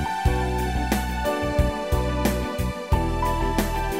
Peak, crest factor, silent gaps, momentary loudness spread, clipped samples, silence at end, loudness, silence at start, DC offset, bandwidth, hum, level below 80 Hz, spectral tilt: -6 dBFS; 16 dB; none; 2 LU; under 0.1%; 0 s; -25 LUFS; 0 s; 0.3%; 16 kHz; none; -28 dBFS; -6 dB/octave